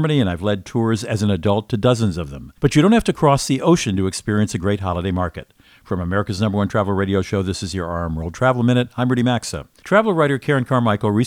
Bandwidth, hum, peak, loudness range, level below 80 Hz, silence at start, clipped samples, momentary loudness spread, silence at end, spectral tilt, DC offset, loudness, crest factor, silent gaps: 15.5 kHz; none; 0 dBFS; 4 LU; -42 dBFS; 0 s; under 0.1%; 9 LU; 0 s; -6 dB/octave; under 0.1%; -19 LUFS; 18 dB; none